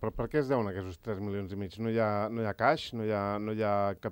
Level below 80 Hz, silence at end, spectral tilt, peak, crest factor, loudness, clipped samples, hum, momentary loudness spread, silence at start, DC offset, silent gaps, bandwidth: -54 dBFS; 0 s; -7.5 dB/octave; -12 dBFS; 20 dB; -32 LUFS; under 0.1%; none; 9 LU; 0 s; under 0.1%; none; 16.5 kHz